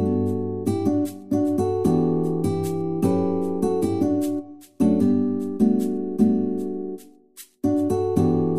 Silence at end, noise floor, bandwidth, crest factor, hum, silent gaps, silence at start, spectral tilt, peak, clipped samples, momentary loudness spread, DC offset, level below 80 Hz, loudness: 0 s; -48 dBFS; 15 kHz; 16 dB; none; none; 0 s; -8.5 dB/octave; -6 dBFS; under 0.1%; 7 LU; 0.8%; -54 dBFS; -23 LUFS